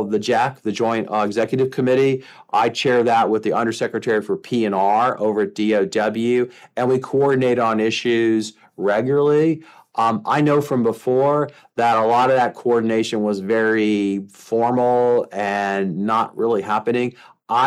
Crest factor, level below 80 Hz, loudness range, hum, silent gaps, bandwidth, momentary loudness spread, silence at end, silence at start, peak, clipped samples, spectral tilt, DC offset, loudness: 14 dB; -68 dBFS; 1 LU; none; none; 13.5 kHz; 6 LU; 0 s; 0 s; -6 dBFS; under 0.1%; -6 dB/octave; under 0.1%; -19 LUFS